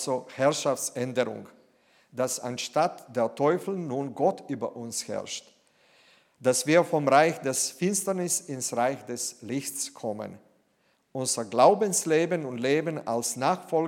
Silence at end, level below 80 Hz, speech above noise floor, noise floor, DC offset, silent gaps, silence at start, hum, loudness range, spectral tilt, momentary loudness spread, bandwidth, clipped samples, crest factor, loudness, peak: 0 s; -80 dBFS; 43 dB; -69 dBFS; under 0.1%; none; 0 s; none; 5 LU; -3.5 dB/octave; 12 LU; 17 kHz; under 0.1%; 22 dB; -27 LUFS; -6 dBFS